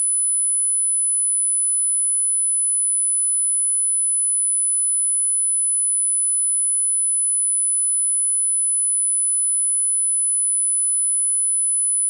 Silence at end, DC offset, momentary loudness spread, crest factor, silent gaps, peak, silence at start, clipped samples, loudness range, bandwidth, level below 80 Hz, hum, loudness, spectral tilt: 0 s; under 0.1%; 0 LU; 4 dB; none; -16 dBFS; 0 s; under 0.1%; 0 LU; 10.5 kHz; under -90 dBFS; 50 Hz at -110 dBFS; -16 LUFS; 5 dB/octave